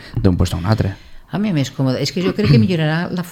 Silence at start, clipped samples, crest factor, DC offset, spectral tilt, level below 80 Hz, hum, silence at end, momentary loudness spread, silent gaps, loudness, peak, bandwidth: 0 s; under 0.1%; 16 dB; under 0.1%; -6.5 dB/octave; -34 dBFS; none; 0 s; 9 LU; none; -17 LUFS; 0 dBFS; 16 kHz